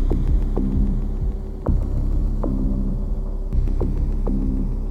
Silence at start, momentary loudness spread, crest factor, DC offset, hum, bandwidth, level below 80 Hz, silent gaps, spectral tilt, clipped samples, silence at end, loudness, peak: 0 s; 5 LU; 14 dB; under 0.1%; none; 2.2 kHz; -20 dBFS; none; -10.5 dB/octave; under 0.1%; 0 s; -25 LUFS; -6 dBFS